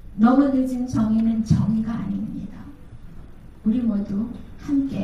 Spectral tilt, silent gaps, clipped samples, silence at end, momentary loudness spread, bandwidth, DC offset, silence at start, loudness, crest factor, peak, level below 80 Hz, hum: -8.5 dB/octave; none; under 0.1%; 0 s; 17 LU; 10.5 kHz; under 0.1%; 0 s; -22 LUFS; 16 dB; -6 dBFS; -42 dBFS; none